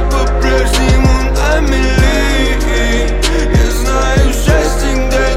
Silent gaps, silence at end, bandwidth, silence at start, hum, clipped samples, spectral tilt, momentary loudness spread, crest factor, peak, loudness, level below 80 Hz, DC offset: none; 0 s; 15.5 kHz; 0 s; none; under 0.1%; -5 dB/octave; 3 LU; 10 dB; 0 dBFS; -12 LUFS; -12 dBFS; under 0.1%